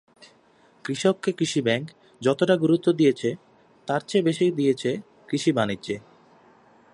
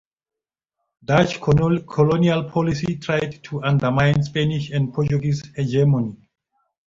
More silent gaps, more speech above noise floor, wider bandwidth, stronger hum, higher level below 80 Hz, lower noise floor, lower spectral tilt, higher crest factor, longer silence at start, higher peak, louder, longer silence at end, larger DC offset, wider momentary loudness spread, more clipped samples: neither; second, 35 dB vs 64 dB; first, 11.5 kHz vs 7.6 kHz; neither; second, -68 dBFS vs -46 dBFS; second, -58 dBFS vs -83 dBFS; second, -5.5 dB/octave vs -7.5 dB/octave; about the same, 18 dB vs 18 dB; second, 0.85 s vs 1.1 s; second, -6 dBFS vs -2 dBFS; second, -24 LUFS vs -20 LUFS; first, 0.95 s vs 0.7 s; neither; first, 13 LU vs 7 LU; neither